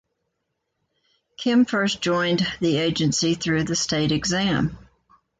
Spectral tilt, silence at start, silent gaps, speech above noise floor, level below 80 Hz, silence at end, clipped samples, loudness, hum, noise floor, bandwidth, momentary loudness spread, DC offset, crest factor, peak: -4.5 dB/octave; 1.4 s; none; 56 dB; -50 dBFS; 0.65 s; under 0.1%; -22 LUFS; none; -77 dBFS; 9.4 kHz; 3 LU; under 0.1%; 14 dB; -8 dBFS